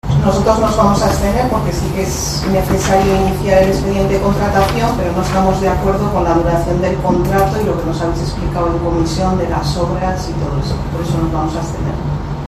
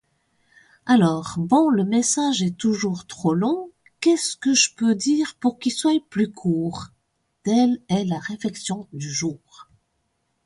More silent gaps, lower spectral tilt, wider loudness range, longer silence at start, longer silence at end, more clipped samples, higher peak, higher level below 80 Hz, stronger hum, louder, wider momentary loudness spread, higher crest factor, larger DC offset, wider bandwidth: neither; first, -6 dB/octave vs -4.5 dB/octave; about the same, 3 LU vs 5 LU; second, 0.05 s vs 0.85 s; second, 0 s vs 0.85 s; neither; first, 0 dBFS vs -4 dBFS; first, -24 dBFS vs -62 dBFS; neither; first, -15 LUFS vs -22 LUFS; second, 7 LU vs 12 LU; about the same, 14 dB vs 18 dB; neither; first, 14 kHz vs 11.5 kHz